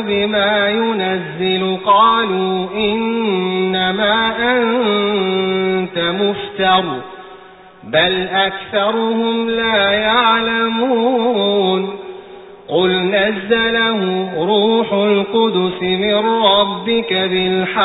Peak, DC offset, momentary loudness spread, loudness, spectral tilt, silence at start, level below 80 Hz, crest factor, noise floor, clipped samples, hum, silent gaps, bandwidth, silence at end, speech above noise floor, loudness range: -2 dBFS; under 0.1%; 6 LU; -15 LUFS; -10.5 dB/octave; 0 s; -50 dBFS; 14 dB; -40 dBFS; under 0.1%; none; none; 4 kHz; 0 s; 24 dB; 2 LU